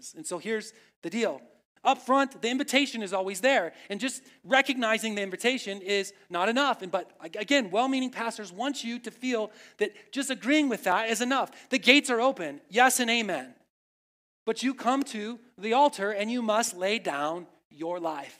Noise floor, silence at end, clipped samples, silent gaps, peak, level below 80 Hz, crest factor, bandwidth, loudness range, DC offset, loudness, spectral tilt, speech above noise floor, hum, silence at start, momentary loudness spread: under -90 dBFS; 0.05 s; under 0.1%; 0.96-1.02 s, 1.65-1.75 s, 13.70-14.46 s, 17.65-17.70 s; -4 dBFS; -84 dBFS; 26 dB; 16 kHz; 5 LU; under 0.1%; -27 LUFS; -2.5 dB/octave; over 62 dB; none; 0.05 s; 12 LU